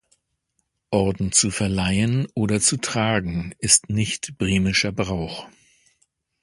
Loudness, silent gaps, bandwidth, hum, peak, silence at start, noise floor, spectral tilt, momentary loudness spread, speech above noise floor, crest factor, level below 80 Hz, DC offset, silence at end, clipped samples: -21 LUFS; none; 11.5 kHz; none; 0 dBFS; 0.9 s; -74 dBFS; -3.5 dB/octave; 9 LU; 52 dB; 22 dB; -42 dBFS; under 0.1%; 0.95 s; under 0.1%